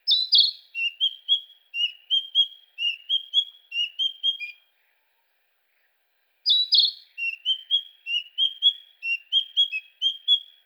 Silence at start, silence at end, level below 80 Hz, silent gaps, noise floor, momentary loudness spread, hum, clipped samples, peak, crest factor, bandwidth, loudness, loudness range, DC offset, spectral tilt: 0.05 s; 0.25 s; under -90 dBFS; none; -70 dBFS; 10 LU; none; under 0.1%; -8 dBFS; 18 dB; over 20 kHz; -22 LUFS; 5 LU; under 0.1%; 9.5 dB/octave